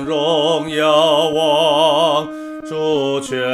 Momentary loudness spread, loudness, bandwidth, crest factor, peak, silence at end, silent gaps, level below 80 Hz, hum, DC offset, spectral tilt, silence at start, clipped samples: 9 LU; -15 LUFS; 14 kHz; 14 dB; -2 dBFS; 0 s; none; -56 dBFS; none; under 0.1%; -4 dB/octave; 0 s; under 0.1%